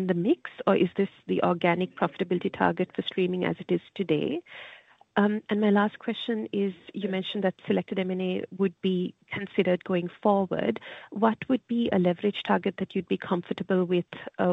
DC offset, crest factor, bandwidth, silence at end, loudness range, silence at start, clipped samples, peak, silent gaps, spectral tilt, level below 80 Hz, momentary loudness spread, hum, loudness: under 0.1%; 20 dB; 4.7 kHz; 0 s; 2 LU; 0 s; under 0.1%; -8 dBFS; none; -8.5 dB/octave; -68 dBFS; 7 LU; none; -28 LUFS